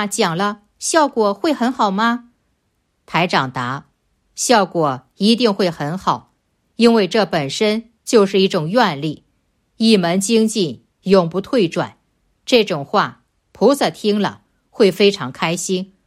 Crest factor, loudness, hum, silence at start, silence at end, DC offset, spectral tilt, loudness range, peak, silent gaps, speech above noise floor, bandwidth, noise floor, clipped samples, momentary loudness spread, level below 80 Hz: 16 dB; -17 LUFS; none; 0 s; 0.2 s; under 0.1%; -4.5 dB/octave; 3 LU; 0 dBFS; none; 51 dB; 15.5 kHz; -67 dBFS; under 0.1%; 10 LU; -60 dBFS